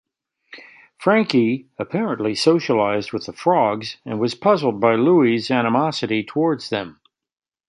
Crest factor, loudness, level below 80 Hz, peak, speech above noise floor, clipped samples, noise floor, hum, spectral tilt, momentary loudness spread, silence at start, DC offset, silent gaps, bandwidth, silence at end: 18 dB; -19 LUFS; -64 dBFS; -2 dBFS; 31 dB; under 0.1%; -50 dBFS; none; -6 dB/octave; 10 LU; 0.55 s; under 0.1%; none; 11.5 kHz; 0.75 s